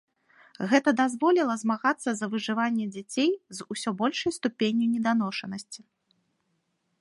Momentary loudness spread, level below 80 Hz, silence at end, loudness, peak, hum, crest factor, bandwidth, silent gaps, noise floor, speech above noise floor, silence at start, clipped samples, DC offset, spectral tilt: 12 LU; -74 dBFS; 1.25 s; -27 LUFS; -8 dBFS; none; 20 dB; 11.5 kHz; none; -75 dBFS; 49 dB; 0.6 s; under 0.1%; under 0.1%; -4.5 dB/octave